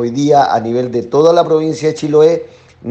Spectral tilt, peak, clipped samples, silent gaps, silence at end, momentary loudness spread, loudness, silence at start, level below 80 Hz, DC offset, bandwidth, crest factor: -6.5 dB/octave; 0 dBFS; 0.1%; none; 0 s; 7 LU; -12 LUFS; 0 s; -56 dBFS; under 0.1%; 8.4 kHz; 12 dB